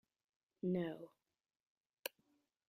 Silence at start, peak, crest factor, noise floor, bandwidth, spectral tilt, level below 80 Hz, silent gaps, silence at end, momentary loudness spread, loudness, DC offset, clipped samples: 0.65 s; -20 dBFS; 28 dB; -81 dBFS; 14 kHz; -6 dB/octave; -84 dBFS; 1.60-1.93 s; 0.6 s; 14 LU; -45 LUFS; under 0.1%; under 0.1%